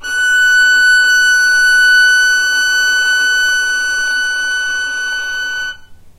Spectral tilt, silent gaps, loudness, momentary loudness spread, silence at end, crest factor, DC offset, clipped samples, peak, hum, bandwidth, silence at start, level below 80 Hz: 3 dB/octave; none; -10 LUFS; 10 LU; 0.1 s; 10 dB; under 0.1%; under 0.1%; -2 dBFS; none; 16 kHz; 0 s; -46 dBFS